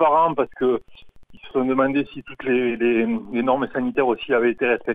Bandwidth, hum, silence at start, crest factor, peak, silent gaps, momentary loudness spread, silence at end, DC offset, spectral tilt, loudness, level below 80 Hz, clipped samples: 4.5 kHz; none; 0 s; 16 dB; -6 dBFS; none; 6 LU; 0 s; 0.4%; -8.5 dB/octave; -21 LUFS; -54 dBFS; under 0.1%